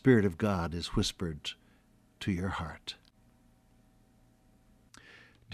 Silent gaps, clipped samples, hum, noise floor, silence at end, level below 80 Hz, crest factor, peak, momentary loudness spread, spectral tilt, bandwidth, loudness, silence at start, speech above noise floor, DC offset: none; under 0.1%; none; -65 dBFS; 0 s; -52 dBFS; 24 dB; -10 dBFS; 24 LU; -6 dB/octave; 14.5 kHz; -33 LUFS; 0.05 s; 34 dB; under 0.1%